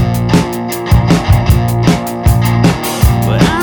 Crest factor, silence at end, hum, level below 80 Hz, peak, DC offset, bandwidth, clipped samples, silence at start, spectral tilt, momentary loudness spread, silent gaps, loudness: 10 dB; 0 s; none; -18 dBFS; 0 dBFS; under 0.1%; over 20 kHz; 0.5%; 0 s; -6 dB/octave; 3 LU; none; -12 LUFS